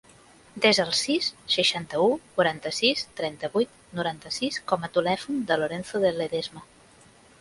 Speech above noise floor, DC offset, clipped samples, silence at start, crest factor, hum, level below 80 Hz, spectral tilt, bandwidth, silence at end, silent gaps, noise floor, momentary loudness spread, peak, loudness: 29 dB; under 0.1%; under 0.1%; 0.55 s; 20 dB; none; -64 dBFS; -3.5 dB/octave; 11.5 kHz; 0.8 s; none; -54 dBFS; 9 LU; -6 dBFS; -25 LUFS